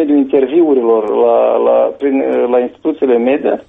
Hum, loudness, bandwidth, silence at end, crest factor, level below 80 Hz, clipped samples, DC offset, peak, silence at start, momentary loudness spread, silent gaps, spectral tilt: none; -12 LUFS; 3.9 kHz; 0.05 s; 10 dB; -56 dBFS; under 0.1%; under 0.1%; -2 dBFS; 0 s; 4 LU; none; -8.5 dB/octave